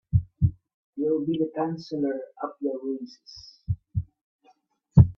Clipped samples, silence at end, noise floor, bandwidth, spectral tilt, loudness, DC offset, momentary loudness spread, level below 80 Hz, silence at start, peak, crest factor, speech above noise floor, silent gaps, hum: under 0.1%; 0.05 s; -64 dBFS; 6.4 kHz; -10 dB/octave; -28 LUFS; under 0.1%; 18 LU; -42 dBFS; 0.15 s; -2 dBFS; 24 dB; 34 dB; 0.74-0.93 s, 4.21-4.39 s; none